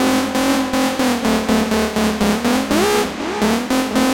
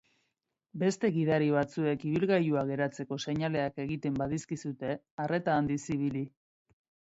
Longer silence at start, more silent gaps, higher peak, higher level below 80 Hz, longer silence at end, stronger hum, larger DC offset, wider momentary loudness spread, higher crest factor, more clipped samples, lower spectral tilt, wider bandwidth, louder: second, 0 s vs 0.75 s; second, none vs 5.11-5.18 s; first, -2 dBFS vs -14 dBFS; first, -40 dBFS vs -62 dBFS; second, 0 s vs 0.8 s; neither; neither; second, 2 LU vs 10 LU; about the same, 14 dB vs 18 dB; neither; second, -4 dB/octave vs -6.5 dB/octave; first, 17 kHz vs 8.2 kHz; first, -17 LUFS vs -31 LUFS